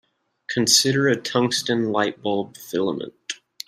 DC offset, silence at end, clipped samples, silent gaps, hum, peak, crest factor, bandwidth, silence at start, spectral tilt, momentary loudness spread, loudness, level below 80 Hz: under 0.1%; 0.3 s; under 0.1%; none; none; -2 dBFS; 22 dB; 15.5 kHz; 0.5 s; -3 dB/octave; 16 LU; -21 LUFS; -66 dBFS